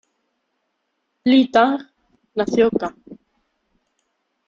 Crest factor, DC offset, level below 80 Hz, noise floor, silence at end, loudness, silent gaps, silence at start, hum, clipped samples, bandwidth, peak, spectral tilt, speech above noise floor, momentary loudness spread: 20 dB; under 0.1%; -60 dBFS; -73 dBFS; 1.35 s; -18 LUFS; none; 1.25 s; none; under 0.1%; 7.4 kHz; -2 dBFS; -5.5 dB/octave; 56 dB; 14 LU